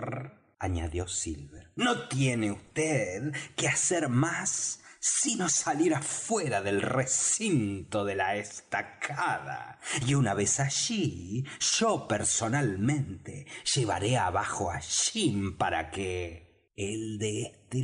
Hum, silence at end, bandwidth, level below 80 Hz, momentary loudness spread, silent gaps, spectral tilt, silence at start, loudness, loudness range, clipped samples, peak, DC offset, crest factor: none; 0 s; 10.5 kHz; -54 dBFS; 10 LU; none; -3.5 dB/octave; 0 s; -29 LUFS; 3 LU; under 0.1%; -16 dBFS; under 0.1%; 14 dB